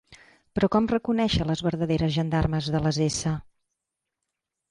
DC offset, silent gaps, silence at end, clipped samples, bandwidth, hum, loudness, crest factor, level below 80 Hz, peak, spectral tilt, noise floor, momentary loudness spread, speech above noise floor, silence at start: under 0.1%; none; 1.3 s; under 0.1%; 11.5 kHz; none; -25 LUFS; 16 dB; -44 dBFS; -12 dBFS; -6 dB/octave; -84 dBFS; 5 LU; 60 dB; 0.1 s